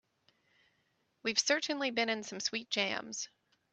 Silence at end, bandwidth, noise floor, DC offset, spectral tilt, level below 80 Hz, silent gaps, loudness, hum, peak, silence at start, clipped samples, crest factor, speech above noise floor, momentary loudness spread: 0.45 s; 8.4 kHz; -77 dBFS; under 0.1%; -1 dB/octave; -84 dBFS; none; -33 LUFS; none; -12 dBFS; 1.25 s; under 0.1%; 26 dB; 42 dB; 11 LU